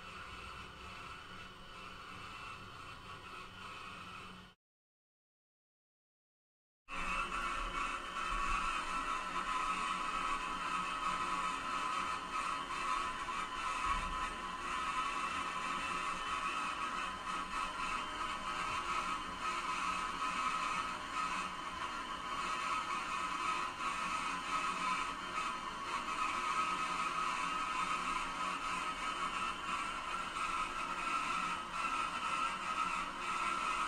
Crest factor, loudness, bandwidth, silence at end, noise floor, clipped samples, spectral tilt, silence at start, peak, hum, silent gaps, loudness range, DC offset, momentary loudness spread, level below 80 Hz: 16 dB; -38 LUFS; 15.5 kHz; 0 s; under -90 dBFS; under 0.1%; -2 dB/octave; 0 s; -24 dBFS; none; 4.56-6.85 s; 12 LU; under 0.1%; 12 LU; -56 dBFS